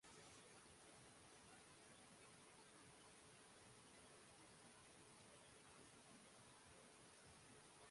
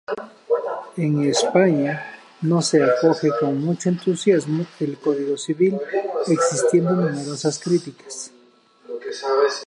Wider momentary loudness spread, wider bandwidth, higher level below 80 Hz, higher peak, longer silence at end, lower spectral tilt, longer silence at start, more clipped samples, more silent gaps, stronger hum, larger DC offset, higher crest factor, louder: second, 1 LU vs 14 LU; about the same, 11.5 kHz vs 11.5 kHz; second, -86 dBFS vs -72 dBFS; second, -52 dBFS vs -4 dBFS; about the same, 0 s vs 0 s; second, -2.5 dB/octave vs -5.5 dB/octave; about the same, 0 s vs 0.1 s; neither; neither; neither; neither; about the same, 16 dB vs 18 dB; second, -65 LUFS vs -21 LUFS